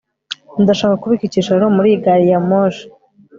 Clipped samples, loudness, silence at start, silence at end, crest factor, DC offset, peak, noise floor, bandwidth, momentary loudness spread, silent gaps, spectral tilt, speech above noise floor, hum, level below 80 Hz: under 0.1%; -14 LUFS; 0.3 s; 0.5 s; 12 dB; under 0.1%; -2 dBFS; -33 dBFS; 7.6 kHz; 14 LU; none; -7 dB/octave; 20 dB; none; -54 dBFS